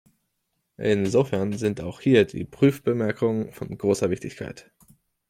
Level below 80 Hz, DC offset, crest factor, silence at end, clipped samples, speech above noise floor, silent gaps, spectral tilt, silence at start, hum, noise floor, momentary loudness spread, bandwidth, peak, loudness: -58 dBFS; under 0.1%; 18 dB; 0.7 s; under 0.1%; 53 dB; none; -6.5 dB/octave; 0.8 s; none; -76 dBFS; 11 LU; 15.5 kHz; -6 dBFS; -24 LUFS